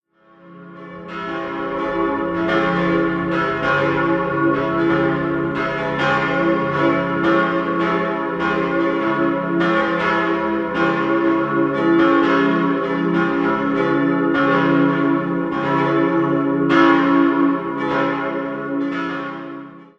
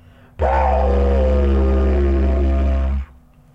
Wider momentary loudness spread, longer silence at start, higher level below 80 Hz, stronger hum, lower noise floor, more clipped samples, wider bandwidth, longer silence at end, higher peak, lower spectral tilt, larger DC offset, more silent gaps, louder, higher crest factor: about the same, 8 LU vs 6 LU; about the same, 0.45 s vs 0.4 s; second, -50 dBFS vs -18 dBFS; neither; about the same, -48 dBFS vs -46 dBFS; neither; first, 7.2 kHz vs 5 kHz; second, 0.15 s vs 0.5 s; first, 0 dBFS vs -6 dBFS; second, -7.5 dB/octave vs -9.5 dB/octave; neither; neither; about the same, -18 LUFS vs -18 LUFS; first, 18 dB vs 10 dB